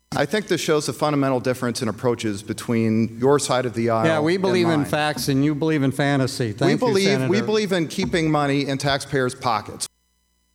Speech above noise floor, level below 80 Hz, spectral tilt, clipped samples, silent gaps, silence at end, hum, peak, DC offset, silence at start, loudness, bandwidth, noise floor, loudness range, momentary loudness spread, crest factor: 46 dB; -52 dBFS; -5.5 dB/octave; under 0.1%; none; 0.65 s; none; -4 dBFS; under 0.1%; 0.1 s; -21 LUFS; 16.5 kHz; -67 dBFS; 2 LU; 5 LU; 16 dB